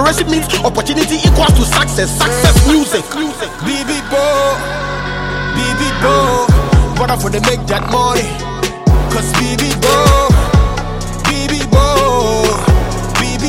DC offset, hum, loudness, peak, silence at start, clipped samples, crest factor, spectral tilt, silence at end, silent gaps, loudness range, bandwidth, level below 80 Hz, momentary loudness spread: under 0.1%; none; -13 LUFS; 0 dBFS; 0 s; under 0.1%; 12 dB; -4.5 dB/octave; 0 s; none; 2 LU; 16.5 kHz; -18 dBFS; 9 LU